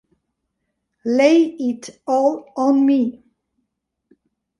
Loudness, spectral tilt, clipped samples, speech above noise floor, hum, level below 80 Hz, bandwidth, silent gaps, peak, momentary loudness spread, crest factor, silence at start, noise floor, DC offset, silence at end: -18 LUFS; -5 dB/octave; under 0.1%; 59 dB; none; -70 dBFS; 11 kHz; none; -2 dBFS; 11 LU; 18 dB; 1.05 s; -76 dBFS; under 0.1%; 1.5 s